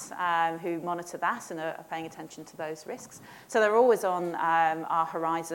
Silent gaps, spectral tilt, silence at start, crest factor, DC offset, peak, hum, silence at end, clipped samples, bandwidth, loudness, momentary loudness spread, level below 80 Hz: none; -4.5 dB/octave; 0 s; 18 dB; under 0.1%; -10 dBFS; none; 0 s; under 0.1%; 17 kHz; -28 LUFS; 18 LU; -76 dBFS